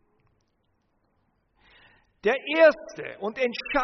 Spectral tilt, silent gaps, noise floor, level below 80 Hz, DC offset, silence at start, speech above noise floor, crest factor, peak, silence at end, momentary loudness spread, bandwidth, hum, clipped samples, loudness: -1.5 dB/octave; none; -71 dBFS; -60 dBFS; under 0.1%; 2.25 s; 48 dB; 20 dB; -6 dBFS; 0 s; 15 LU; 6.4 kHz; none; under 0.1%; -24 LUFS